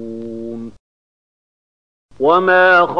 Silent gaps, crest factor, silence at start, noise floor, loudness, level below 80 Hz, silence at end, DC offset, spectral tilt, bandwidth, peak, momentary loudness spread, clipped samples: 0.80-2.09 s; 16 dB; 0 s; under -90 dBFS; -12 LUFS; -56 dBFS; 0 s; 0.7%; -6.5 dB/octave; 7 kHz; 0 dBFS; 21 LU; under 0.1%